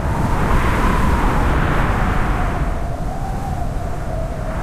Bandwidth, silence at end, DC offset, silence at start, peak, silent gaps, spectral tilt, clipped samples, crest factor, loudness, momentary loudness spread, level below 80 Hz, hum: 15 kHz; 0 s; under 0.1%; 0 s; -4 dBFS; none; -6.5 dB/octave; under 0.1%; 12 dB; -20 LUFS; 8 LU; -20 dBFS; none